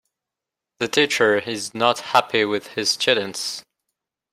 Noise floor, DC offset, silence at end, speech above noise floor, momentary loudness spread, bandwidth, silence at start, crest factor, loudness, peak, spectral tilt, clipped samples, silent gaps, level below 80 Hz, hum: -86 dBFS; under 0.1%; 0.7 s; 65 dB; 10 LU; 16 kHz; 0.8 s; 22 dB; -20 LUFS; 0 dBFS; -2.5 dB/octave; under 0.1%; none; -68 dBFS; none